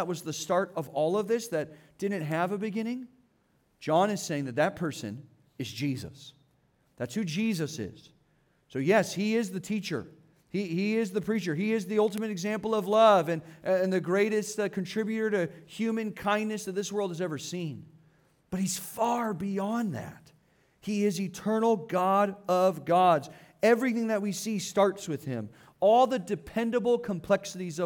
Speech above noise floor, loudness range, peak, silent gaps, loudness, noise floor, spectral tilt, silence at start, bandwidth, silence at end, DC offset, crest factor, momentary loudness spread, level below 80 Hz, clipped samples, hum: 41 dB; 7 LU; -10 dBFS; none; -29 LUFS; -69 dBFS; -5.5 dB/octave; 0 s; 18.5 kHz; 0 s; under 0.1%; 20 dB; 12 LU; -68 dBFS; under 0.1%; none